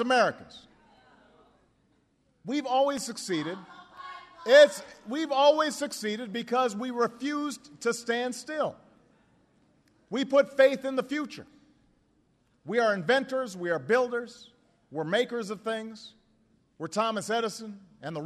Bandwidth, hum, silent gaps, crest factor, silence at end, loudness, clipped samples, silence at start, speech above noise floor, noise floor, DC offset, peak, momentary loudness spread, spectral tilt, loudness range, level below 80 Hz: 13.5 kHz; none; none; 22 dB; 0 s; -27 LUFS; under 0.1%; 0 s; 42 dB; -69 dBFS; under 0.1%; -6 dBFS; 20 LU; -3.5 dB/octave; 8 LU; -76 dBFS